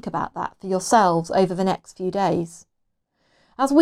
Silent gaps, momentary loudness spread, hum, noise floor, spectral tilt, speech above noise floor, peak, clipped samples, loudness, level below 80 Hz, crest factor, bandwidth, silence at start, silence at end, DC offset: none; 11 LU; none; -73 dBFS; -5.5 dB/octave; 51 dB; -4 dBFS; under 0.1%; -22 LUFS; -56 dBFS; 18 dB; 15 kHz; 0.05 s; 0 s; under 0.1%